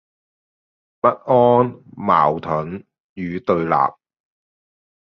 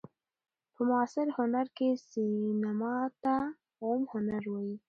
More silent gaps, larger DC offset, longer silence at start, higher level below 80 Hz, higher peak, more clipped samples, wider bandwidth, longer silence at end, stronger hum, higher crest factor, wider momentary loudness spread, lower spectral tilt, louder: first, 3.00-3.16 s vs none; neither; first, 1.05 s vs 0.8 s; first, -54 dBFS vs -72 dBFS; first, -2 dBFS vs -18 dBFS; neither; second, 6.2 kHz vs 7.2 kHz; first, 1.1 s vs 0.1 s; neither; about the same, 18 dB vs 16 dB; first, 14 LU vs 5 LU; first, -9.5 dB/octave vs -7.5 dB/octave; first, -18 LUFS vs -33 LUFS